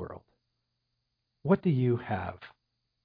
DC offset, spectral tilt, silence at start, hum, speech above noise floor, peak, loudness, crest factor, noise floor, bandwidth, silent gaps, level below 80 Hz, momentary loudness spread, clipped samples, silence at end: under 0.1%; -11.5 dB/octave; 0 s; none; 53 dB; -12 dBFS; -29 LUFS; 20 dB; -81 dBFS; 5 kHz; none; -64 dBFS; 21 LU; under 0.1%; 0.55 s